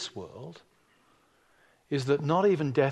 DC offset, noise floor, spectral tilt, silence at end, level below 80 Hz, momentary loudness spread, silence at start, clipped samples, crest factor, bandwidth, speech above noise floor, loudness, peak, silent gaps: under 0.1%; -65 dBFS; -6.5 dB/octave; 0 s; -70 dBFS; 20 LU; 0 s; under 0.1%; 18 dB; 11 kHz; 38 dB; -27 LUFS; -12 dBFS; none